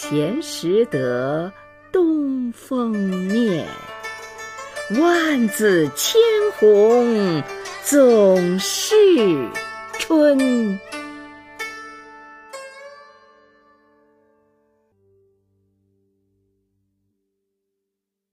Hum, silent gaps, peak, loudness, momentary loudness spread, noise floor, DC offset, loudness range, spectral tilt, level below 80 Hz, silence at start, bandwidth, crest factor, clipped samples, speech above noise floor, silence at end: none; none; -4 dBFS; -18 LUFS; 19 LU; -82 dBFS; under 0.1%; 12 LU; -4.5 dB/octave; -62 dBFS; 0 s; 15.5 kHz; 16 dB; under 0.1%; 65 dB; 5.4 s